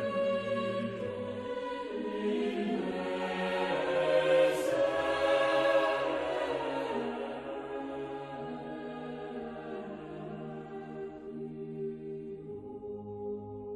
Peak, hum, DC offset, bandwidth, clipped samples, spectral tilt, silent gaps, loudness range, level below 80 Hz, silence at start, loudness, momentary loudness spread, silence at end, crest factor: -16 dBFS; none; under 0.1%; 13 kHz; under 0.1%; -5.5 dB/octave; none; 13 LU; -66 dBFS; 0 s; -33 LUFS; 15 LU; 0 s; 18 dB